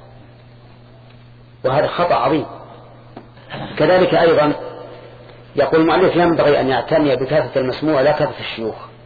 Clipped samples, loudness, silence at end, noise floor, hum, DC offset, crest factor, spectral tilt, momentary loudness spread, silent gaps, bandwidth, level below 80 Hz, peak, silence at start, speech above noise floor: under 0.1%; -16 LUFS; 0.15 s; -43 dBFS; none; under 0.1%; 14 dB; -8.5 dB/octave; 17 LU; none; 4.9 kHz; -48 dBFS; -4 dBFS; 0.2 s; 27 dB